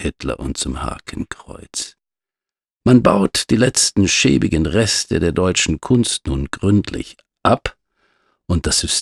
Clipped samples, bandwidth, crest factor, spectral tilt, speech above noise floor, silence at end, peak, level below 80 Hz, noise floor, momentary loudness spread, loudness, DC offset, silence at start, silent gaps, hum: under 0.1%; 13.5 kHz; 18 dB; -4 dB/octave; over 73 dB; 0 s; -2 dBFS; -34 dBFS; under -90 dBFS; 15 LU; -17 LUFS; under 0.1%; 0 s; none; none